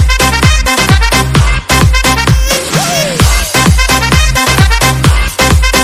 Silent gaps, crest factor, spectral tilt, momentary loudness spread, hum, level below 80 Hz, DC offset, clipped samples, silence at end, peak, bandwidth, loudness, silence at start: none; 8 dB; -3.5 dB/octave; 3 LU; none; -12 dBFS; under 0.1%; 1%; 0 s; 0 dBFS; 16.5 kHz; -8 LUFS; 0 s